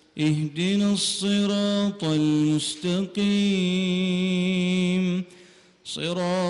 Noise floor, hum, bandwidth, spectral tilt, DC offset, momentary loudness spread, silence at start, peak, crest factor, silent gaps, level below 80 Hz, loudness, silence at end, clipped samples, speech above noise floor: -52 dBFS; none; 11 kHz; -5.5 dB/octave; under 0.1%; 6 LU; 0.15 s; -14 dBFS; 10 dB; none; -62 dBFS; -24 LUFS; 0 s; under 0.1%; 29 dB